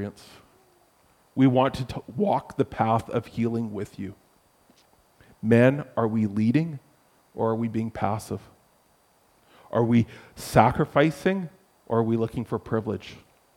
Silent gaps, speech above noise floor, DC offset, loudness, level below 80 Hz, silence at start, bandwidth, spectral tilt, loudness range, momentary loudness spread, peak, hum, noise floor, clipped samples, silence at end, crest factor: none; 38 dB; under 0.1%; -25 LUFS; -54 dBFS; 0 s; 16 kHz; -7.5 dB/octave; 4 LU; 16 LU; -2 dBFS; none; -63 dBFS; under 0.1%; 0.4 s; 24 dB